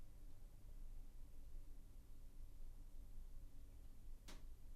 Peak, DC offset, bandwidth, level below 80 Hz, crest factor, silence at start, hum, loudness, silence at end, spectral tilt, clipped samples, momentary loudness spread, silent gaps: -44 dBFS; under 0.1%; 13.5 kHz; -56 dBFS; 10 dB; 0 s; none; -64 LUFS; 0 s; -5 dB/octave; under 0.1%; 3 LU; none